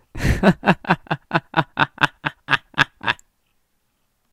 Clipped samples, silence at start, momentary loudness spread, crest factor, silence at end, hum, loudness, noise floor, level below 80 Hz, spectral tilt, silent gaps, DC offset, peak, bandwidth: under 0.1%; 0.15 s; 7 LU; 22 dB; 1.2 s; none; -20 LUFS; -68 dBFS; -36 dBFS; -5.5 dB/octave; none; under 0.1%; 0 dBFS; 16 kHz